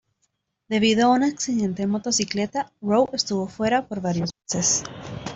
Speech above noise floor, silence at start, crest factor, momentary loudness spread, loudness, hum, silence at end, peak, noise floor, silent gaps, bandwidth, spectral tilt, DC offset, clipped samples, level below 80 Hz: 50 dB; 0.7 s; 16 dB; 9 LU; -23 LUFS; none; 0 s; -6 dBFS; -73 dBFS; none; 8.2 kHz; -3.5 dB/octave; under 0.1%; under 0.1%; -56 dBFS